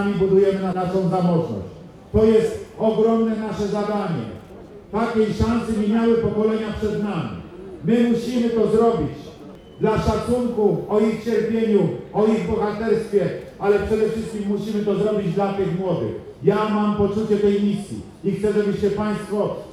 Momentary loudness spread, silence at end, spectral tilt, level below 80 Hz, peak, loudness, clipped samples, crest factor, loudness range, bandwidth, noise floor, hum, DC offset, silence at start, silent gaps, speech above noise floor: 10 LU; 0 s; -7.5 dB/octave; -42 dBFS; -4 dBFS; -21 LUFS; under 0.1%; 18 dB; 2 LU; 12 kHz; -40 dBFS; none; under 0.1%; 0 s; none; 20 dB